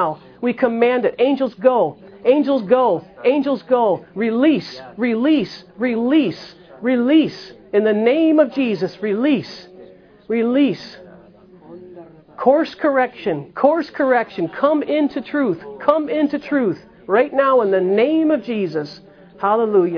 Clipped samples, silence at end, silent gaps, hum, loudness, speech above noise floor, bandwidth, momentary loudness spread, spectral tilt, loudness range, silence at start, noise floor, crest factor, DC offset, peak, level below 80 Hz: under 0.1%; 0 s; none; none; -18 LUFS; 28 dB; 5.4 kHz; 9 LU; -7.5 dB/octave; 3 LU; 0 s; -45 dBFS; 18 dB; under 0.1%; 0 dBFS; -62 dBFS